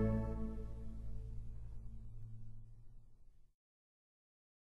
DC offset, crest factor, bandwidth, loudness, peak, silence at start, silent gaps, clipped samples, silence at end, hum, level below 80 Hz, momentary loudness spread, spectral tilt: under 0.1%; 20 dB; 4 kHz; -48 LUFS; -26 dBFS; 0 s; none; under 0.1%; 1.05 s; none; -50 dBFS; 20 LU; -10 dB/octave